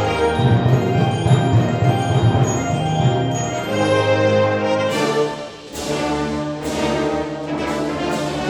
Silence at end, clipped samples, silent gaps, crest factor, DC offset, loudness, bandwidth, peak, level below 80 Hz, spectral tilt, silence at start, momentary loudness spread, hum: 0 s; under 0.1%; none; 16 dB; under 0.1%; -18 LUFS; 13.5 kHz; -2 dBFS; -40 dBFS; -6 dB/octave; 0 s; 8 LU; none